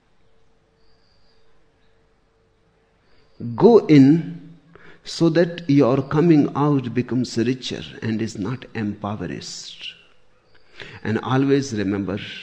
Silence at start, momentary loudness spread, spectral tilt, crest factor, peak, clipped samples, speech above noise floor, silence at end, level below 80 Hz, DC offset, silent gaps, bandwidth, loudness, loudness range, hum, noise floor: 3.4 s; 19 LU; -7 dB/octave; 20 dB; -2 dBFS; under 0.1%; 42 dB; 0 s; -56 dBFS; under 0.1%; none; 9 kHz; -19 LUFS; 11 LU; none; -61 dBFS